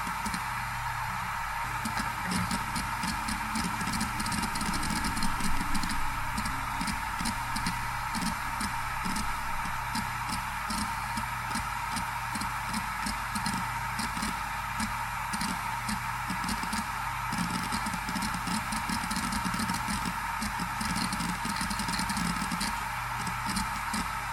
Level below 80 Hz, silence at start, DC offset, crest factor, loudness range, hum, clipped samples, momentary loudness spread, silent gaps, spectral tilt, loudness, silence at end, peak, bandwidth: -42 dBFS; 0 s; under 0.1%; 18 dB; 1 LU; none; under 0.1%; 2 LU; none; -3 dB/octave; -32 LUFS; 0 s; -14 dBFS; 18 kHz